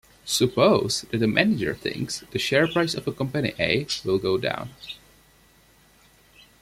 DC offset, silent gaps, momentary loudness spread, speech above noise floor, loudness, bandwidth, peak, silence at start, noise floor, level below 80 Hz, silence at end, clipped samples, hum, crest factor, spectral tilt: under 0.1%; none; 11 LU; 33 dB; -24 LUFS; 16 kHz; -2 dBFS; 0.25 s; -57 dBFS; -56 dBFS; 1.65 s; under 0.1%; none; 22 dB; -4.5 dB/octave